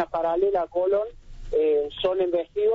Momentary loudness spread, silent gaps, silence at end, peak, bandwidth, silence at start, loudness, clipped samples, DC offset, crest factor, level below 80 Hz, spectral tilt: 4 LU; none; 0 s; -10 dBFS; 5.8 kHz; 0 s; -24 LUFS; under 0.1%; under 0.1%; 14 dB; -46 dBFS; -3.5 dB/octave